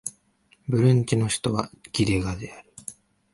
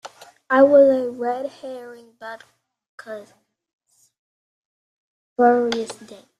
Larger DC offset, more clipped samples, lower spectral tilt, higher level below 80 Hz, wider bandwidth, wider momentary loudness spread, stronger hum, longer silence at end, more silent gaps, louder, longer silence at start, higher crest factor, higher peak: neither; neither; about the same, -5.5 dB/octave vs -4.5 dB/octave; first, -46 dBFS vs -70 dBFS; about the same, 11.5 kHz vs 10.5 kHz; second, 20 LU vs 24 LU; neither; first, 0.4 s vs 0.25 s; second, none vs 2.89-2.98 s, 3.73-3.79 s, 4.19-5.36 s; second, -24 LUFS vs -18 LUFS; about the same, 0.05 s vs 0.05 s; about the same, 18 dB vs 20 dB; second, -6 dBFS vs -2 dBFS